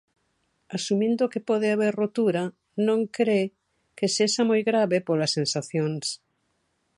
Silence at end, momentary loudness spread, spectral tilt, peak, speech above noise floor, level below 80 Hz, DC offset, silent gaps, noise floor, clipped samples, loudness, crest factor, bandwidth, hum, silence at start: 0.8 s; 9 LU; -4.5 dB/octave; -10 dBFS; 49 dB; -74 dBFS; under 0.1%; none; -73 dBFS; under 0.1%; -25 LUFS; 16 dB; 11.5 kHz; none; 0.7 s